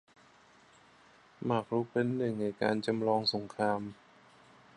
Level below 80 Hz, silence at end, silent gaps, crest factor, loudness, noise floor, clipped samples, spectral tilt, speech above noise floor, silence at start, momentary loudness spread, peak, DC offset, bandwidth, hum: -74 dBFS; 0.85 s; none; 20 dB; -33 LUFS; -61 dBFS; under 0.1%; -6.5 dB/octave; 30 dB; 1.4 s; 5 LU; -14 dBFS; under 0.1%; 10.5 kHz; none